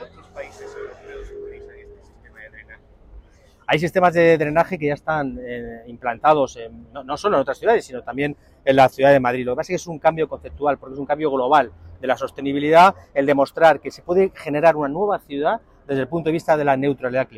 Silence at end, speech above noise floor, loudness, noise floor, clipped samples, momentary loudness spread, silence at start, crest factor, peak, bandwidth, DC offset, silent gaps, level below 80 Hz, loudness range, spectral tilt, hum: 0.1 s; 30 dB; -19 LUFS; -49 dBFS; under 0.1%; 20 LU; 0 s; 16 dB; -4 dBFS; 15 kHz; under 0.1%; none; -50 dBFS; 5 LU; -6 dB/octave; none